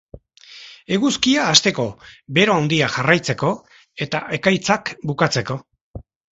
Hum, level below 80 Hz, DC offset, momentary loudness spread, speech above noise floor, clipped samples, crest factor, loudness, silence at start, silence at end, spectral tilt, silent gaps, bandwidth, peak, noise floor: none; -52 dBFS; under 0.1%; 15 LU; 24 dB; under 0.1%; 20 dB; -18 LUFS; 0.15 s; 0.3 s; -4 dB/octave; 5.81-5.94 s; 8.2 kHz; 0 dBFS; -43 dBFS